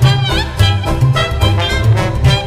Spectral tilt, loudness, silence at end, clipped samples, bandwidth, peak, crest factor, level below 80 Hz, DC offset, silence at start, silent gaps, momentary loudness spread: -5.5 dB/octave; -13 LUFS; 0 s; under 0.1%; 15.5 kHz; 0 dBFS; 12 dB; -20 dBFS; under 0.1%; 0 s; none; 1 LU